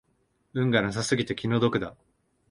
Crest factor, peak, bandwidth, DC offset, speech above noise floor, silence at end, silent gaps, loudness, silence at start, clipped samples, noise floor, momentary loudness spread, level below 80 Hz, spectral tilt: 20 dB; -8 dBFS; 11 kHz; under 0.1%; 45 dB; 0.6 s; none; -27 LUFS; 0.55 s; under 0.1%; -70 dBFS; 9 LU; -58 dBFS; -5.5 dB/octave